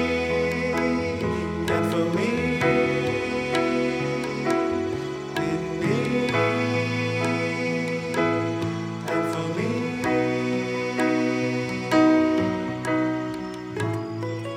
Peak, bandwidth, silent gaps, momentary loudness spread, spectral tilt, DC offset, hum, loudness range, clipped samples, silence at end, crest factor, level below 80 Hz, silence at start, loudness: -8 dBFS; 15 kHz; none; 6 LU; -6 dB/octave; under 0.1%; none; 2 LU; under 0.1%; 0 s; 16 dB; -50 dBFS; 0 s; -24 LUFS